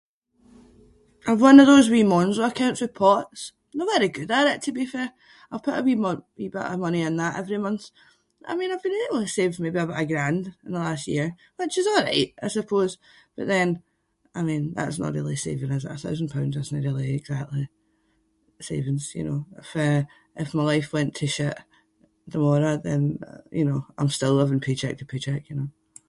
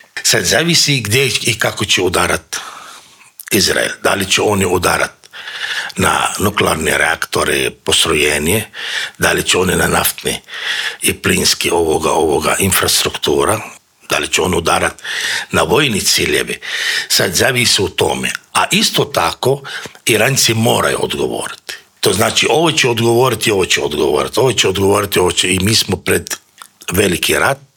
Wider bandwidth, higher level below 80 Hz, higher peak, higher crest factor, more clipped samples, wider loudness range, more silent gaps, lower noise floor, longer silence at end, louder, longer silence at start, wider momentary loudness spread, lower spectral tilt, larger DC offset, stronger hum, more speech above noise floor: second, 11.5 kHz vs 20 kHz; second, -60 dBFS vs -44 dBFS; about the same, 0 dBFS vs 0 dBFS; first, 24 dB vs 14 dB; neither; first, 11 LU vs 2 LU; neither; first, -68 dBFS vs -40 dBFS; first, 0.4 s vs 0.2 s; second, -24 LUFS vs -13 LUFS; first, 1.25 s vs 0.15 s; first, 13 LU vs 8 LU; first, -6 dB/octave vs -3 dB/octave; neither; neither; first, 45 dB vs 25 dB